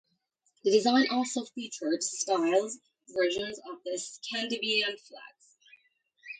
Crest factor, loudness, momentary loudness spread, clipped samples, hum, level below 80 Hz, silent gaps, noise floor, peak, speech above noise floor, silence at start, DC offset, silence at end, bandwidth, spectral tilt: 20 dB; -29 LUFS; 14 LU; under 0.1%; none; -76 dBFS; none; -75 dBFS; -12 dBFS; 46 dB; 0.65 s; under 0.1%; 0.05 s; 9.6 kHz; -2 dB/octave